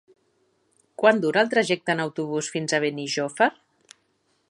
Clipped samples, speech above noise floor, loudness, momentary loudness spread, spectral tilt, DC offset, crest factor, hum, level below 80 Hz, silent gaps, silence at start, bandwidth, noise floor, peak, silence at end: under 0.1%; 46 dB; -23 LUFS; 7 LU; -4 dB/octave; under 0.1%; 22 dB; none; -76 dBFS; none; 1 s; 11 kHz; -69 dBFS; -4 dBFS; 1 s